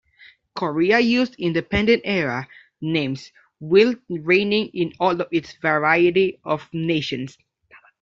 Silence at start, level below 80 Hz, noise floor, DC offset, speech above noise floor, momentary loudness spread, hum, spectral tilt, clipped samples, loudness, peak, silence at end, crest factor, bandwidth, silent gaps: 0.55 s; -52 dBFS; -53 dBFS; under 0.1%; 32 dB; 14 LU; none; -6.5 dB/octave; under 0.1%; -20 LUFS; -4 dBFS; 0.7 s; 18 dB; 7.6 kHz; none